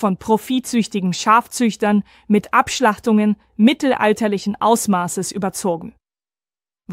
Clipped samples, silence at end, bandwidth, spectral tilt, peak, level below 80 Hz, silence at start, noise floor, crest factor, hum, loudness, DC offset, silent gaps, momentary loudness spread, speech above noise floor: under 0.1%; 0 s; 16 kHz; -5 dB/octave; -2 dBFS; -56 dBFS; 0 s; under -90 dBFS; 16 dB; none; -18 LUFS; under 0.1%; none; 7 LU; over 73 dB